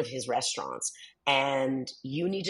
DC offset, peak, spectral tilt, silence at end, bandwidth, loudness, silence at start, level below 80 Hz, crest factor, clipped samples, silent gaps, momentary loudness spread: under 0.1%; -10 dBFS; -3 dB/octave; 0 s; 11.5 kHz; -30 LUFS; 0 s; -76 dBFS; 22 dB; under 0.1%; none; 9 LU